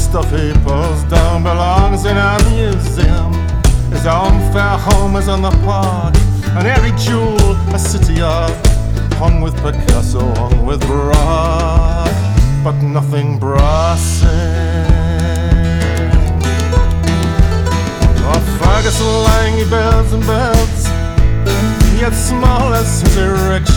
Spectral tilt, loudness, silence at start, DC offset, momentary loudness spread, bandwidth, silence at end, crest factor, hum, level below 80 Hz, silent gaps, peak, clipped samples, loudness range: -6 dB/octave; -13 LUFS; 0 s; under 0.1%; 3 LU; 18.5 kHz; 0 s; 10 dB; none; -14 dBFS; none; -2 dBFS; under 0.1%; 1 LU